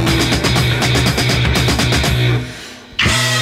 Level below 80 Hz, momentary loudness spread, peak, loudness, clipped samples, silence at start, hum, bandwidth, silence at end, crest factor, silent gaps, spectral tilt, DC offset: -26 dBFS; 7 LU; -2 dBFS; -14 LUFS; under 0.1%; 0 s; none; 16 kHz; 0 s; 14 dB; none; -4 dB/octave; under 0.1%